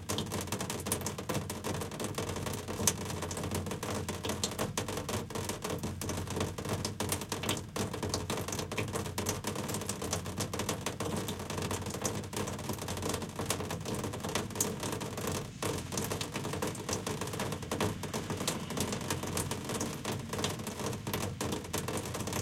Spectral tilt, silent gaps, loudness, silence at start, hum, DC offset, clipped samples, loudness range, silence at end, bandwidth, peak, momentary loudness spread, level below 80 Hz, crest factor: -4 dB/octave; none; -36 LUFS; 0 s; none; under 0.1%; under 0.1%; 1 LU; 0 s; 17 kHz; -10 dBFS; 3 LU; -56 dBFS; 26 dB